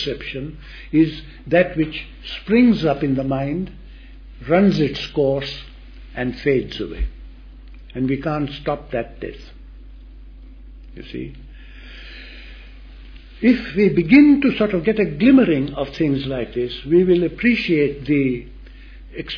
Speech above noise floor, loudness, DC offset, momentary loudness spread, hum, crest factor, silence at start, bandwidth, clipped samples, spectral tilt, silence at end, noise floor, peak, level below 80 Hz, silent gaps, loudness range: 21 dB; -18 LUFS; under 0.1%; 21 LU; none; 18 dB; 0 s; 5.4 kHz; under 0.1%; -8 dB/octave; 0 s; -39 dBFS; -2 dBFS; -38 dBFS; none; 17 LU